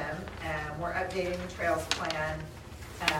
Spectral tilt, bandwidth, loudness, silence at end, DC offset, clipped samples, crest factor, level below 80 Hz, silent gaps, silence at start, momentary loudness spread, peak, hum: -4 dB/octave; 16 kHz; -33 LUFS; 0 s; under 0.1%; under 0.1%; 26 dB; -48 dBFS; none; 0 s; 11 LU; -6 dBFS; none